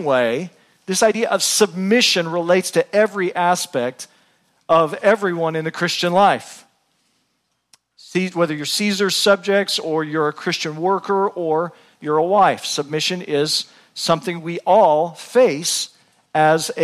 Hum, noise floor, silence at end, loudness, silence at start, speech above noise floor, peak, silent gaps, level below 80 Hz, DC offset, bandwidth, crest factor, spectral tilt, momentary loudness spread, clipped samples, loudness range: none; -70 dBFS; 0 s; -18 LUFS; 0 s; 52 dB; -2 dBFS; none; -68 dBFS; under 0.1%; 15.5 kHz; 16 dB; -3.5 dB/octave; 10 LU; under 0.1%; 4 LU